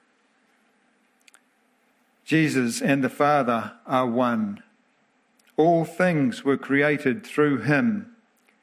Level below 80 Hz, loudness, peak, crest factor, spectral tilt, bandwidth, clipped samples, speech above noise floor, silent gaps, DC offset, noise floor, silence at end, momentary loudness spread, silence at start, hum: -72 dBFS; -23 LUFS; -6 dBFS; 18 dB; -6 dB/octave; 16 kHz; under 0.1%; 43 dB; none; under 0.1%; -65 dBFS; 0.6 s; 7 LU; 2.3 s; none